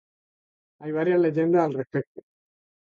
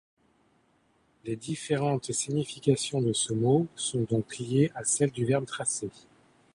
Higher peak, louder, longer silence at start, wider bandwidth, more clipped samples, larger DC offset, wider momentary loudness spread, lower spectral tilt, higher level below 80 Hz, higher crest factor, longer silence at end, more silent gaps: about the same, -10 dBFS vs -10 dBFS; first, -24 LUFS vs -28 LUFS; second, 0.8 s vs 1.25 s; second, 6.8 kHz vs 11.5 kHz; neither; neither; first, 14 LU vs 9 LU; first, -9.5 dB/octave vs -5 dB/octave; second, -74 dBFS vs -64 dBFS; about the same, 16 dB vs 20 dB; first, 0.7 s vs 0.55 s; first, 2.07-2.15 s vs none